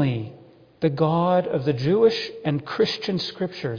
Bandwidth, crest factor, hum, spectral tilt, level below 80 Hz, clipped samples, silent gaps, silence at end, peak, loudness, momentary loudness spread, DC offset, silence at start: 5.4 kHz; 16 dB; none; -7 dB/octave; -60 dBFS; under 0.1%; none; 0 s; -6 dBFS; -23 LUFS; 9 LU; under 0.1%; 0 s